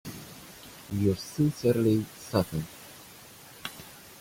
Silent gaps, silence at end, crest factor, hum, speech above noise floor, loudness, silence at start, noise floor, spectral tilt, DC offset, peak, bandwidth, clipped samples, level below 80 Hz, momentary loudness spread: none; 0.05 s; 18 dB; none; 23 dB; -29 LUFS; 0.05 s; -50 dBFS; -6.5 dB/octave; under 0.1%; -12 dBFS; 16.5 kHz; under 0.1%; -58 dBFS; 21 LU